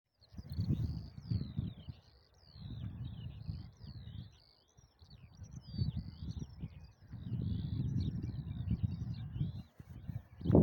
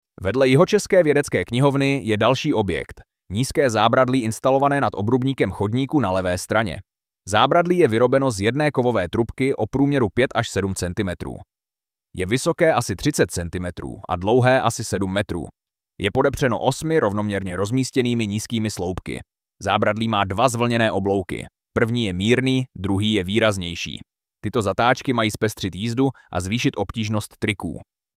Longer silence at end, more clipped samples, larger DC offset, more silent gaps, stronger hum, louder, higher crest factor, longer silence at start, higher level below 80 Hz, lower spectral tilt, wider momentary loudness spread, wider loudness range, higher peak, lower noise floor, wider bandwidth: second, 0 s vs 0.35 s; neither; neither; neither; neither; second, -42 LUFS vs -21 LUFS; first, 26 dB vs 20 dB; about the same, 0.2 s vs 0.2 s; second, -52 dBFS vs -46 dBFS; first, -9.5 dB/octave vs -5.5 dB/octave; first, 16 LU vs 12 LU; first, 9 LU vs 4 LU; second, -14 dBFS vs -2 dBFS; second, -66 dBFS vs under -90 dBFS; about the same, 17 kHz vs 16 kHz